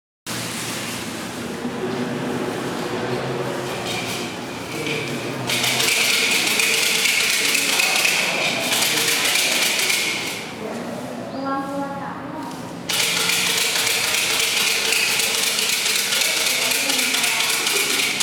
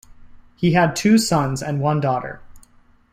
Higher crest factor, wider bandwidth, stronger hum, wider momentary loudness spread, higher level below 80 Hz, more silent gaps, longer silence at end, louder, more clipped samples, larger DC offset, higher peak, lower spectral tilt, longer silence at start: about the same, 20 dB vs 16 dB; first, over 20 kHz vs 16 kHz; neither; about the same, 12 LU vs 10 LU; second, -60 dBFS vs -50 dBFS; neither; second, 0 s vs 0.55 s; about the same, -19 LUFS vs -19 LUFS; neither; neither; about the same, -2 dBFS vs -4 dBFS; second, -1 dB/octave vs -5.5 dB/octave; about the same, 0.25 s vs 0.2 s